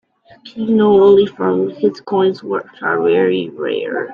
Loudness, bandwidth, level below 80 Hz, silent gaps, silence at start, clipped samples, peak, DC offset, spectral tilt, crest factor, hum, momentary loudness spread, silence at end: -15 LUFS; 5.2 kHz; -56 dBFS; none; 0.45 s; under 0.1%; 0 dBFS; under 0.1%; -8 dB/octave; 14 dB; none; 12 LU; 0 s